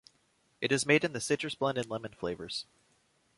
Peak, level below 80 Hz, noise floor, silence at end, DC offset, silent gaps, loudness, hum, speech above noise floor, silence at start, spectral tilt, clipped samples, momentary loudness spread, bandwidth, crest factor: -10 dBFS; -68 dBFS; -71 dBFS; 0.75 s; under 0.1%; none; -32 LUFS; none; 39 dB; 0.6 s; -4 dB/octave; under 0.1%; 12 LU; 11.5 kHz; 22 dB